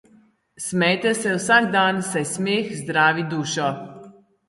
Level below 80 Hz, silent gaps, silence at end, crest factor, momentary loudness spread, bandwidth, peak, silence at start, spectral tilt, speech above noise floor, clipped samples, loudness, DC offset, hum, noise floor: -66 dBFS; none; 0.4 s; 20 dB; 10 LU; 11.5 kHz; -2 dBFS; 0.6 s; -4 dB/octave; 35 dB; under 0.1%; -20 LUFS; under 0.1%; none; -56 dBFS